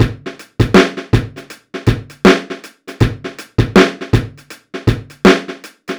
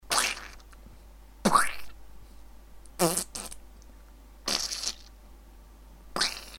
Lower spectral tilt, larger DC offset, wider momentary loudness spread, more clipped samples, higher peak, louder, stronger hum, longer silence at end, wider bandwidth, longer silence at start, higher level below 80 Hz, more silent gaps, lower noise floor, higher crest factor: first, -6 dB/octave vs -2 dB/octave; neither; second, 19 LU vs 23 LU; first, 0.7% vs under 0.1%; first, 0 dBFS vs -6 dBFS; first, -14 LUFS vs -29 LUFS; neither; about the same, 0 s vs 0 s; first, over 20 kHz vs 17.5 kHz; about the same, 0 s vs 0.05 s; first, -30 dBFS vs -50 dBFS; neither; second, -34 dBFS vs -50 dBFS; second, 14 dB vs 26 dB